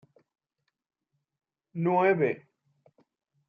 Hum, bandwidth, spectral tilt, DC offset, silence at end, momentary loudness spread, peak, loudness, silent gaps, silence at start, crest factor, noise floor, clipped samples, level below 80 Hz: none; 4.9 kHz; -10 dB/octave; under 0.1%; 1.1 s; 16 LU; -12 dBFS; -26 LUFS; none; 1.75 s; 20 dB; -83 dBFS; under 0.1%; -82 dBFS